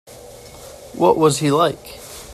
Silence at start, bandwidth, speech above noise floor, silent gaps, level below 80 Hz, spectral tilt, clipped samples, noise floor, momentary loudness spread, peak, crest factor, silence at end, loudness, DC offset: 0.1 s; 14.5 kHz; 23 dB; none; -50 dBFS; -5 dB/octave; under 0.1%; -39 dBFS; 23 LU; -2 dBFS; 18 dB; 0 s; -17 LUFS; under 0.1%